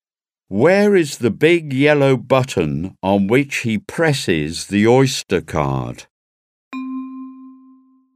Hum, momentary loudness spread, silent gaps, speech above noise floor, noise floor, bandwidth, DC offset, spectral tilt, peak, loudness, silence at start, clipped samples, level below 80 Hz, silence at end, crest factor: none; 16 LU; 6.10-6.71 s; 65 dB; -81 dBFS; 15.5 kHz; under 0.1%; -5.5 dB/octave; 0 dBFS; -17 LUFS; 0.5 s; under 0.1%; -46 dBFS; 0.65 s; 18 dB